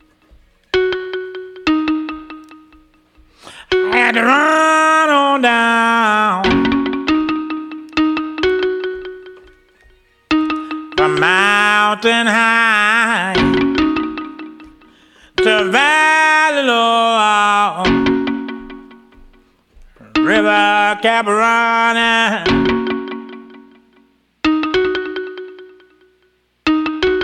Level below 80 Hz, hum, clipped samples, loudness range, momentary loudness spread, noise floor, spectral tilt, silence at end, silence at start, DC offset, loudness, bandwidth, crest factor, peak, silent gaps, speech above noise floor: -44 dBFS; none; under 0.1%; 8 LU; 15 LU; -59 dBFS; -4 dB/octave; 0 s; 0.75 s; under 0.1%; -14 LUFS; 13 kHz; 16 dB; 0 dBFS; none; 46 dB